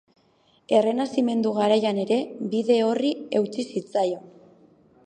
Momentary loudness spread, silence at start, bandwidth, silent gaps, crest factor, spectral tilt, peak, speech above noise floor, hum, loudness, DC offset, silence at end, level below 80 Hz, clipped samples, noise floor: 7 LU; 0.7 s; 9.6 kHz; none; 18 dB; -6 dB/octave; -6 dBFS; 39 dB; none; -24 LUFS; under 0.1%; 0.75 s; -76 dBFS; under 0.1%; -62 dBFS